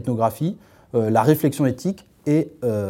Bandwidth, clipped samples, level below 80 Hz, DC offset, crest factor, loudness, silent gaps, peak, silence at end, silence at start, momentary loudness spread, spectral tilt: 17 kHz; under 0.1%; -60 dBFS; under 0.1%; 18 dB; -21 LUFS; none; -2 dBFS; 0 s; 0 s; 10 LU; -7.5 dB/octave